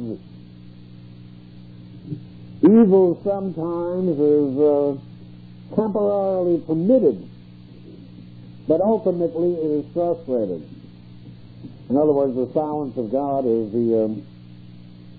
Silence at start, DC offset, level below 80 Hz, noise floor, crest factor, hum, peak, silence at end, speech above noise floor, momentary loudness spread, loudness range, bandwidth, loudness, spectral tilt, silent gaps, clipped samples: 0 s; under 0.1%; -56 dBFS; -42 dBFS; 16 dB; 60 Hz at -45 dBFS; -6 dBFS; 0 s; 23 dB; 24 LU; 5 LU; 4.8 kHz; -20 LUFS; -13 dB/octave; none; under 0.1%